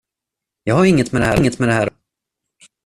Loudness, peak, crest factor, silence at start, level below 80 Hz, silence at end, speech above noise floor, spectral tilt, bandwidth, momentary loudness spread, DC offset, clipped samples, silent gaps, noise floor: -16 LUFS; -2 dBFS; 16 dB; 0.65 s; -40 dBFS; 0.95 s; 69 dB; -6.5 dB/octave; 13.5 kHz; 8 LU; under 0.1%; under 0.1%; none; -84 dBFS